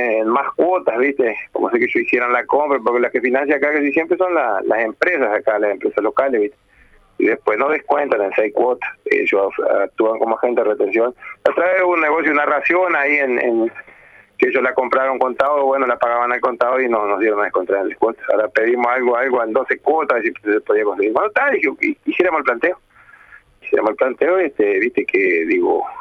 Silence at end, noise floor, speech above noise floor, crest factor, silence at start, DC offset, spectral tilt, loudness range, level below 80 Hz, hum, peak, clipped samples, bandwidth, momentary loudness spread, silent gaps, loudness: 0 s; -51 dBFS; 34 dB; 14 dB; 0 s; under 0.1%; -6.5 dB/octave; 2 LU; -60 dBFS; none; -2 dBFS; under 0.1%; 6.6 kHz; 4 LU; none; -17 LUFS